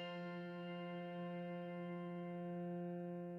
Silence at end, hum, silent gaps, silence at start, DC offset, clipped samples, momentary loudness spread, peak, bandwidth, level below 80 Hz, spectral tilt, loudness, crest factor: 0 s; none; none; 0 s; under 0.1%; under 0.1%; 2 LU; -38 dBFS; 5.6 kHz; under -90 dBFS; -9 dB/octave; -48 LUFS; 10 dB